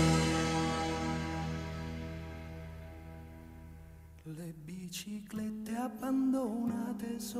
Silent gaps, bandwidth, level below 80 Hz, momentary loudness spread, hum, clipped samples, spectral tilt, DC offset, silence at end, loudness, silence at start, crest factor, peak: none; 16 kHz; -54 dBFS; 20 LU; none; under 0.1%; -5.5 dB/octave; under 0.1%; 0 s; -36 LUFS; 0 s; 18 dB; -18 dBFS